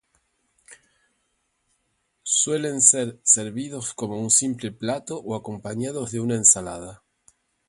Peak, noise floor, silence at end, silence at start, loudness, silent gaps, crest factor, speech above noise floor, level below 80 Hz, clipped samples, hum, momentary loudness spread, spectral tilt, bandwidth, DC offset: -2 dBFS; -72 dBFS; 0.75 s; 0.7 s; -21 LUFS; none; 24 dB; 49 dB; -60 dBFS; under 0.1%; none; 16 LU; -3 dB/octave; 11.5 kHz; under 0.1%